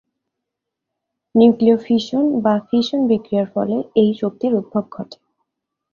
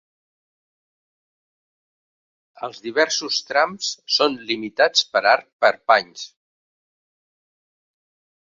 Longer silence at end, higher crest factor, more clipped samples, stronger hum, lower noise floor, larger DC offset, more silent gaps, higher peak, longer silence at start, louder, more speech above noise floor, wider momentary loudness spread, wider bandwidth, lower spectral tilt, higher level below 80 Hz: second, 0.8 s vs 2.2 s; second, 16 dB vs 24 dB; neither; neither; second, -81 dBFS vs under -90 dBFS; neither; second, none vs 5.53-5.59 s; about the same, -2 dBFS vs 0 dBFS; second, 1.35 s vs 2.6 s; about the same, -17 LUFS vs -19 LUFS; second, 64 dB vs over 70 dB; second, 11 LU vs 16 LU; second, 7 kHz vs 7.8 kHz; first, -7.5 dB/octave vs -1 dB/octave; first, -60 dBFS vs -72 dBFS